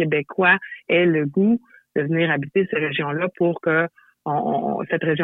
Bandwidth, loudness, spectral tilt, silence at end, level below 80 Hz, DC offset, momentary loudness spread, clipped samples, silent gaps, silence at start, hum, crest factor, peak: 4.1 kHz; -21 LUFS; -9.5 dB/octave; 0 s; -66 dBFS; under 0.1%; 8 LU; under 0.1%; none; 0 s; none; 16 dB; -6 dBFS